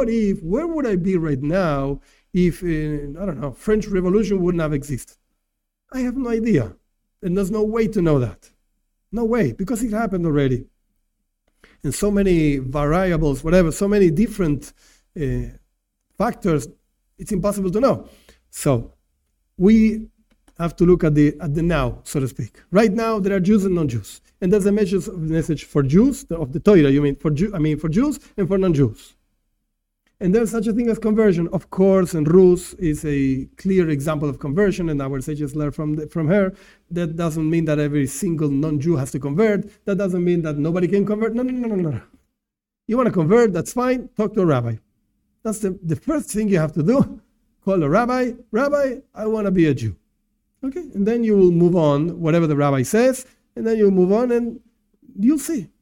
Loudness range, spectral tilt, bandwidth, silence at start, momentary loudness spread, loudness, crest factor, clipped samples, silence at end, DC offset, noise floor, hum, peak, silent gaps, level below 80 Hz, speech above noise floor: 5 LU; -7.5 dB/octave; 17 kHz; 0 s; 11 LU; -20 LUFS; 18 dB; under 0.1%; 0.15 s; under 0.1%; -84 dBFS; none; -2 dBFS; none; -38 dBFS; 65 dB